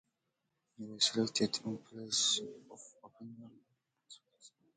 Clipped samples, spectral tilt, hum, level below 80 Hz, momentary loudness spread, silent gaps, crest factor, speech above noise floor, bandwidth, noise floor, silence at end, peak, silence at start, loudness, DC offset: under 0.1%; -2.5 dB/octave; none; -80 dBFS; 24 LU; none; 24 dB; 48 dB; 9.4 kHz; -85 dBFS; 0.3 s; -16 dBFS; 0.8 s; -33 LUFS; under 0.1%